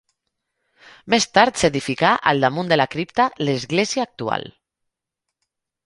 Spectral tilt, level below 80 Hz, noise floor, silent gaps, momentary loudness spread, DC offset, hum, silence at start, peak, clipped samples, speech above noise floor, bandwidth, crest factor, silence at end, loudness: -4 dB/octave; -54 dBFS; -82 dBFS; none; 8 LU; under 0.1%; none; 1.05 s; 0 dBFS; under 0.1%; 63 dB; 11.5 kHz; 22 dB; 1.35 s; -19 LUFS